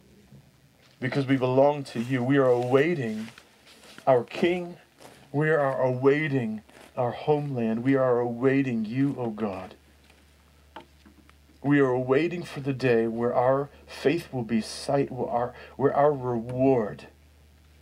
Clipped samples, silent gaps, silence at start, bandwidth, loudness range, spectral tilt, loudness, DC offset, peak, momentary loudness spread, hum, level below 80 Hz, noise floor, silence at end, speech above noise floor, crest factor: under 0.1%; none; 1 s; 13.5 kHz; 4 LU; -7.5 dB/octave; -26 LUFS; under 0.1%; -8 dBFS; 11 LU; none; -60 dBFS; -58 dBFS; 0.75 s; 33 dB; 18 dB